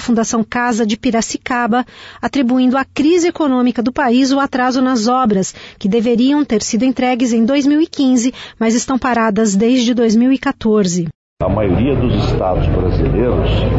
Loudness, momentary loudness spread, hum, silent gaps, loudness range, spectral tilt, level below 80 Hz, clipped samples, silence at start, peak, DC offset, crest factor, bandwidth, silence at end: -14 LUFS; 5 LU; none; 11.15-11.37 s; 2 LU; -5.5 dB/octave; -28 dBFS; under 0.1%; 0 s; -4 dBFS; under 0.1%; 10 dB; 8 kHz; 0 s